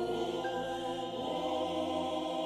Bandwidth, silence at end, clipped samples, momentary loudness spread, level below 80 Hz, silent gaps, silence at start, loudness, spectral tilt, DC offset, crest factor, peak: 14 kHz; 0 s; under 0.1%; 3 LU; -64 dBFS; none; 0 s; -35 LUFS; -5 dB/octave; under 0.1%; 12 dB; -22 dBFS